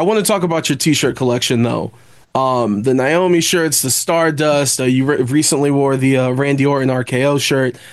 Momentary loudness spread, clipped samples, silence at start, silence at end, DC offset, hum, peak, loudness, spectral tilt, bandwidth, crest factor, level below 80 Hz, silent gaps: 3 LU; under 0.1%; 0 s; 0 s; 0.1%; none; -4 dBFS; -15 LUFS; -4.5 dB/octave; 13 kHz; 12 dB; -54 dBFS; none